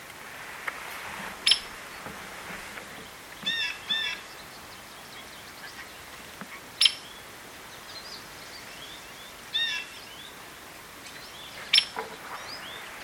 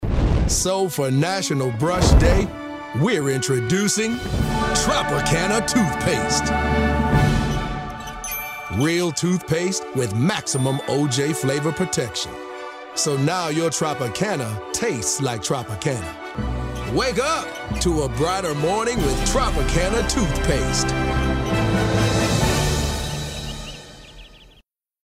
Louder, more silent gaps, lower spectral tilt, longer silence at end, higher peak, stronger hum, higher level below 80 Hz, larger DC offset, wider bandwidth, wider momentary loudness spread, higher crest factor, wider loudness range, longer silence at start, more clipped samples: second, -29 LUFS vs -21 LUFS; neither; second, 0 dB/octave vs -4.5 dB/octave; second, 0 s vs 0.65 s; about the same, -4 dBFS vs -2 dBFS; neither; second, -64 dBFS vs -28 dBFS; neither; about the same, 17 kHz vs 16 kHz; first, 20 LU vs 9 LU; first, 30 dB vs 18 dB; about the same, 6 LU vs 4 LU; about the same, 0 s vs 0 s; neither